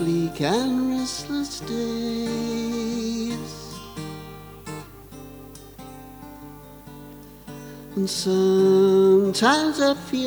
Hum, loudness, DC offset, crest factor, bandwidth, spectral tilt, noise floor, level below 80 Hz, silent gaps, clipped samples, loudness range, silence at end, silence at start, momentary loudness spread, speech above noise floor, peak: none; -22 LUFS; under 0.1%; 20 dB; over 20 kHz; -5 dB/octave; -42 dBFS; -52 dBFS; none; under 0.1%; 20 LU; 0 s; 0 s; 24 LU; 22 dB; -4 dBFS